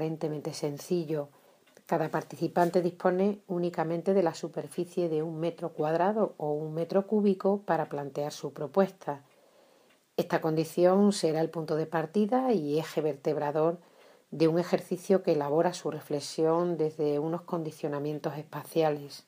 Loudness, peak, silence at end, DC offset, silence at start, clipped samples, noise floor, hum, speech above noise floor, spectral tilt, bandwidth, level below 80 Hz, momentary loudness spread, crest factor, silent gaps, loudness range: -30 LUFS; -12 dBFS; 0.1 s; under 0.1%; 0 s; under 0.1%; -64 dBFS; none; 35 dB; -6.5 dB/octave; 15.5 kHz; -82 dBFS; 9 LU; 18 dB; none; 3 LU